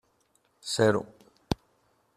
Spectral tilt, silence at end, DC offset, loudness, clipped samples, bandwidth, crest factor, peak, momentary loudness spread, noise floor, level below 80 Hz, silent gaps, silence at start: -5 dB/octave; 0.6 s; under 0.1%; -29 LUFS; under 0.1%; 14.5 kHz; 24 dB; -8 dBFS; 17 LU; -70 dBFS; -54 dBFS; none; 0.65 s